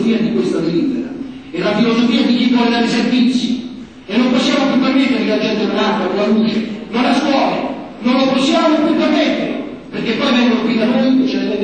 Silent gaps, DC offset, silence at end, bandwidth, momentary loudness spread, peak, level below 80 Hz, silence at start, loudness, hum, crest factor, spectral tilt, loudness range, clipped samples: none; 0.3%; 0 s; 9 kHz; 9 LU; -2 dBFS; -52 dBFS; 0 s; -15 LUFS; none; 12 dB; -5.5 dB/octave; 1 LU; under 0.1%